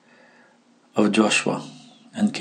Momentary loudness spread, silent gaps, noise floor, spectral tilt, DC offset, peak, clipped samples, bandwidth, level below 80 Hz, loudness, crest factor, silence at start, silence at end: 18 LU; none; -57 dBFS; -4 dB/octave; under 0.1%; -4 dBFS; under 0.1%; 10 kHz; -76 dBFS; -22 LUFS; 20 dB; 0.95 s; 0 s